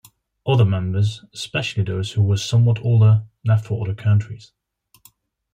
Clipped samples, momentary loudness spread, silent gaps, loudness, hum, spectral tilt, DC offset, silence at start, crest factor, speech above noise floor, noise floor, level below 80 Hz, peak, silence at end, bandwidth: under 0.1%; 10 LU; none; -20 LUFS; none; -6.5 dB/octave; under 0.1%; 0.45 s; 14 dB; 37 dB; -55 dBFS; -54 dBFS; -4 dBFS; 1.15 s; 9.2 kHz